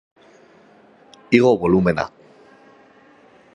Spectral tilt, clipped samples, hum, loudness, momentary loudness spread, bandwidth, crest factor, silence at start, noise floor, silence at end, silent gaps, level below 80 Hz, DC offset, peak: -7.5 dB/octave; under 0.1%; none; -18 LUFS; 10 LU; 9.8 kHz; 22 dB; 1.3 s; -51 dBFS; 1.45 s; none; -50 dBFS; under 0.1%; 0 dBFS